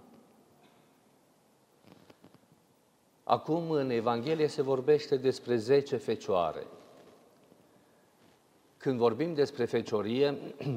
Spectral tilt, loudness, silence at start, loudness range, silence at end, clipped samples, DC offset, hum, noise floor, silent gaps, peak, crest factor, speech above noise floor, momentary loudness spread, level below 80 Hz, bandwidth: -6.5 dB/octave; -30 LUFS; 3.3 s; 8 LU; 0 s; under 0.1%; under 0.1%; none; -67 dBFS; none; -10 dBFS; 22 dB; 38 dB; 7 LU; -76 dBFS; 12.5 kHz